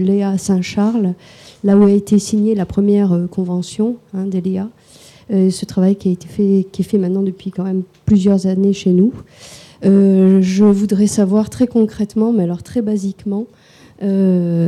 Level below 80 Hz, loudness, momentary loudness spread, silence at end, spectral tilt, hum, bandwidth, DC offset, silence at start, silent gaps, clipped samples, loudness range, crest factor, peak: -48 dBFS; -15 LUFS; 10 LU; 0 s; -7.5 dB/octave; none; 12 kHz; under 0.1%; 0 s; none; under 0.1%; 4 LU; 12 dB; -4 dBFS